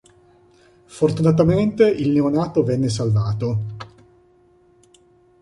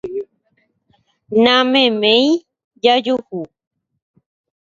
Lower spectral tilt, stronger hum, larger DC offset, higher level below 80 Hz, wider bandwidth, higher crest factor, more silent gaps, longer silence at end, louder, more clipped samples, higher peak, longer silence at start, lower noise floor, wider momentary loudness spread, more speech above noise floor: first, -8 dB/octave vs -4.5 dB/octave; neither; neither; first, -48 dBFS vs -62 dBFS; first, 11.5 kHz vs 7.6 kHz; about the same, 18 dB vs 18 dB; second, none vs 2.64-2.71 s; first, 1.55 s vs 1.2 s; second, -19 LUFS vs -14 LUFS; neither; second, -4 dBFS vs 0 dBFS; first, 0.9 s vs 0.05 s; second, -55 dBFS vs -64 dBFS; second, 10 LU vs 17 LU; second, 37 dB vs 50 dB